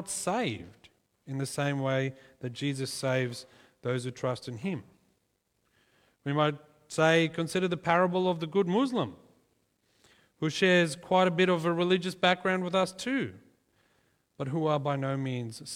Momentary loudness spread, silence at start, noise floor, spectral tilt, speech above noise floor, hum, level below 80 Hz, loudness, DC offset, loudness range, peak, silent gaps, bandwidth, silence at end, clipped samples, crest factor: 13 LU; 0 s; -76 dBFS; -5 dB/octave; 47 dB; none; -70 dBFS; -29 LUFS; under 0.1%; 8 LU; -10 dBFS; none; 15.5 kHz; 0 s; under 0.1%; 22 dB